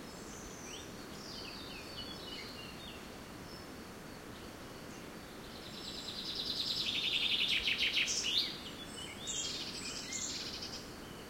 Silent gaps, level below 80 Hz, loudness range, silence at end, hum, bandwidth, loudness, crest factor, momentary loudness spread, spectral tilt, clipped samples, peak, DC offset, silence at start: none; -62 dBFS; 14 LU; 0 s; none; 16.5 kHz; -37 LUFS; 22 dB; 18 LU; -1 dB/octave; under 0.1%; -18 dBFS; under 0.1%; 0 s